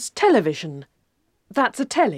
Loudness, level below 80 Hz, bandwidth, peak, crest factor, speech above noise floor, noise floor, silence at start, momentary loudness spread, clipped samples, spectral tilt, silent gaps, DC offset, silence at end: -21 LUFS; -66 dBFS; 15 kHz; -4 dBFS; 16 dB; 48 dB; -69 dBFS; 0 s; 16 LU; under 0.1%; -4.5 dB/octave; none; under 0.1%; 0 s